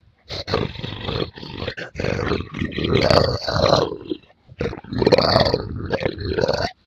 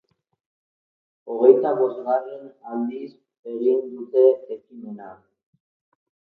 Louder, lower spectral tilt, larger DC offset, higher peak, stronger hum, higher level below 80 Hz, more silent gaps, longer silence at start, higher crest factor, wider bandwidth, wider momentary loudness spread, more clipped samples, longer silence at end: about the same, -21 LUFS vs -21 LUFS; second, -6 dB/octave vs -10 dB/octave; neither; about the same, 0 dBFS vs -2 dBFS; neither; first, -38 dBFS vs -82 dBFS; second, none vs 3.39-3.43 s; second, 0.3 s vs 1.25 s; about the same, 22 dB vs 22 dB; first, 14 kHz vs 4 kHz; second, 13 LU vs 22 LU; neither; second, 0.15 s vs 1.1 s